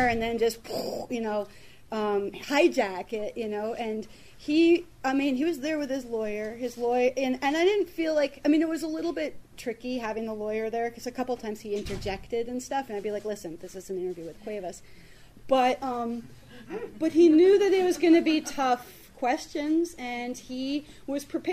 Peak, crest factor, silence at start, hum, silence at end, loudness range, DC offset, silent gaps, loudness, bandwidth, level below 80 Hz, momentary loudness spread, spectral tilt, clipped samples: -10 dBFS; 18 dB; 0 s; none; 0 s; 10 LU; 0.2%; none; -27 LUFS; 15 kHz; -54 dBFS; 15 LU; -4.5 dB/octave; under 0.1%